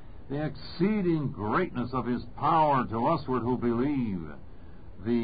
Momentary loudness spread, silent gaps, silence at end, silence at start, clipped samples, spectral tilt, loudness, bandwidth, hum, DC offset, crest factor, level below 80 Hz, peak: 12 LU; none; 0 s; 0 s; under 0.1%; -11.5 dB/octave; -29 LUFS; 5 kHz; none; 0.7%; 14 dB; -50 dBFS; -14 dBFS